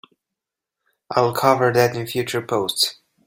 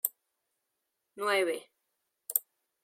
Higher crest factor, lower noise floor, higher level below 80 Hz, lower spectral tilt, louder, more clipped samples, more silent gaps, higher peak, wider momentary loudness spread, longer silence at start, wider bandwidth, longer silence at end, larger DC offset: second, 20 dB vs 30 dB; about the same, -85 dBFS vs -84 dBFS; first, -60 dBFS vs under -90 dBFS; first, -4 dB/octave vs -1 dB/octave; first, -20 LUFS vs -32 LUFS; neither; neither; first, 0 dBFS vs -6 dBFS; second, 8 LU vs 11 LU; first, 1.1 s vs 0.05 s; about the same, 16.5 kHz vs 16.5 kHz; about the same, 0.35 s vs 0.45 s; neither